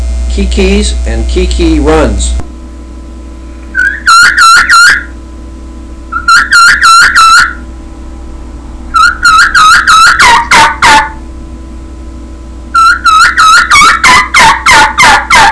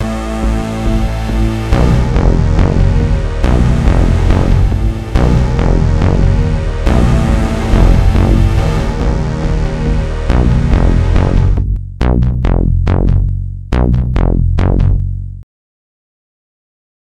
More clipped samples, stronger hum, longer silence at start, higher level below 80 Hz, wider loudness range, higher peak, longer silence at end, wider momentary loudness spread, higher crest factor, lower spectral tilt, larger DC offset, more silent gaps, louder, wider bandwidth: first, 9% vs 0.1%; neither; about the same, 0 s vs 0 s; about the same, -18 dBFS vs -14 dBFS; first, 5 LU vs 2 LU; about the same, 0 dBFS vs 0 dBFS; second, 0 s vs 1.75 s; first, 12 LU vs 5 LU; second, 6 dB vs 12 dB; second, -2.5 dB/octave vs -8 dB/octave; second, under 0.1% vs 2%; neither; first, -3 LUFS vs -13 LUFS; about the same, 11 kHz vs 10 kHz